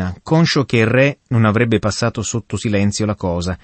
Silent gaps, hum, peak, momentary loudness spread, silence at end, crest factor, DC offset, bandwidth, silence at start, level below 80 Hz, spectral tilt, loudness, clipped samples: none; none; -2 dBFS; 7 LU; 0.05 s; 14 dB; under 0.1%; 8.8 kHz; 0 s; -42 dBFS; -5.5 dB/octave; -17 LUFS; under 0.1%